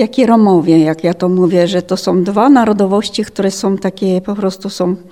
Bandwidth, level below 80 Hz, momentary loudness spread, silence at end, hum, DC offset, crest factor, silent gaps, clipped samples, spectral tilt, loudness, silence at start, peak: 16 kHz; -52 dBFS; 9 LU; 0.1 s; none; 0.3%; 12 dB; none; under 0.1%; -6.5 dB/octave; -12 LUFS; 0 s; 0 dBFS